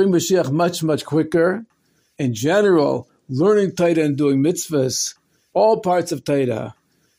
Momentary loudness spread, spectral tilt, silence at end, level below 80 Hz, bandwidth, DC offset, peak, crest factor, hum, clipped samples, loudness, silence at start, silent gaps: 10 LU; -5.5 dB/octave; 0.45 s; -60 dBFS; 16 kHz; under 0.1%; -4 dBFS; 14 dB; none; under 0.1%; -19 LUFS; 0 s; none